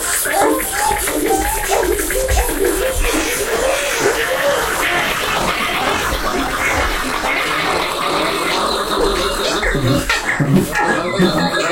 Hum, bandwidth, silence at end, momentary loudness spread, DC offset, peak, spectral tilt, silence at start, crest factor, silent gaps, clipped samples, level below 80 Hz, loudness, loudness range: none; 16.5 kHz; 0 s; 2 LU; under 0.1%; -2 dBFS; -3 dB/octave; 0 s; 14 dB; none; under 0.1%; -28 dBFS; -16 LUFS; 1 LU